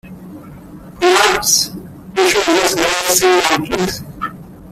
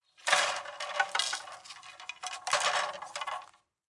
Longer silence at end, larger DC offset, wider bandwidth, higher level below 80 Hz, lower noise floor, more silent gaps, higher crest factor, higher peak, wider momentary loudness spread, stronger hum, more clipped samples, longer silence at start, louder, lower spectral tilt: second, 0 s vs 0.45 s; neither; first, 16 kHz vs 12 kHz; first, -44 dBFS vs -84 dBFS; second, -35 dBFS vs -53 dBFS; neither; second, 16 dB vs 24 dB; first, 0 dBFS vs -10 dBFS; about the same, 17 LU vs 17 LU; neither; neither; second, 0.05 s vs 0.2 s; first, -13 LUFS vs -31 LUFS; first, -2 dB/octave vs 2 dB/octave